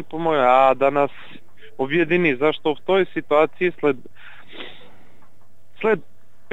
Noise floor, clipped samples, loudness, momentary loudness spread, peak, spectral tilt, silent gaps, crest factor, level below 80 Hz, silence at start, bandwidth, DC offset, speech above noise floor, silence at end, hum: -58 dBFS; under 0.1%; -20 LUFS; 19 LU; -4 dBFS; -7.5 dB/octave; none; 18 dB; -66 dBFS; 0 s; 7.8 kHz; 2%; 39 dB; 0.5 s; none